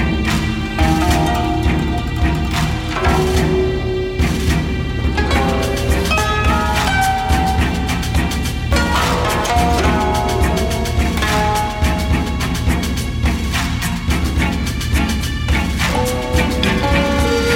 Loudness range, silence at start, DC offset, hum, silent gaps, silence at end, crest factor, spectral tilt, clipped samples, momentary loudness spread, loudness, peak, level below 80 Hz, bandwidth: 2 LU; 0 s; under 0.1%; none; none; 0 s; 14 dB; -5 dB/octave; under 0.1%; 4 LU; -17 LUFS; -2 dBFS; -22 dBFS; 16.5 kHz